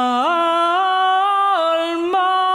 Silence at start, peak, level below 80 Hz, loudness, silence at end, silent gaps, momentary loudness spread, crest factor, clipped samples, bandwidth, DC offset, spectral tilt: 0 s; -8 dBFS; -70 dBFS; -17 LUFS; 0 s; none; 3 LU; 8 dB; under 0.1%; 11 kHz; under 0.1%; -2 dB/octave